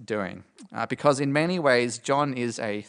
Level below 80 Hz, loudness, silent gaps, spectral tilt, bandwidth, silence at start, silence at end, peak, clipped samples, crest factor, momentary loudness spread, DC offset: -70 dBFS; -25 LUFS; none; -5 dB/octave; 10.5 kHz; 0 s; 0.05 s; -6 dBFS; under 0.1%; 20 dB; 13 LU; under 0.1%